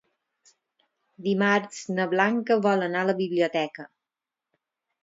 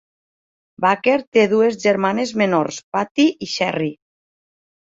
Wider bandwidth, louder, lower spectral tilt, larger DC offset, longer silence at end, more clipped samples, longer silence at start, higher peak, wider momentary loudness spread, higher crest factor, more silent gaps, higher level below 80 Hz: about the same, 7.8 kHz vs 7.8 kHz; second, -25 LUFS vs -18 LUFS; about the same, -5.5 dB/octave vs -5 dB/octave; neither; first, 1.2 s vs 0.95 s; neither; first, 1.2 s vs 0.8 s; second, -6 dBFS vs -2 dBFS; about the same, 9 LU vs 7 LU; about the same, 22 dB vs 18 dB; second, none vs 1.27-1.32 s, 2.84-2.92 s, 3.11-3.15 s; second, -78 dBFS vs -64 dBFS